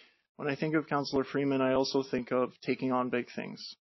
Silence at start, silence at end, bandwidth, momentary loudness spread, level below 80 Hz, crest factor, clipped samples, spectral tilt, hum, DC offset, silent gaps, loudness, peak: 0.4 s; 0.05 s; 6.2 kHz; 10 LU; -68 dBFS; 16 dB; under 0.1%; -4.5 dB/octave; none; under 0.1%; none; -32 LUFS; -16 dBFS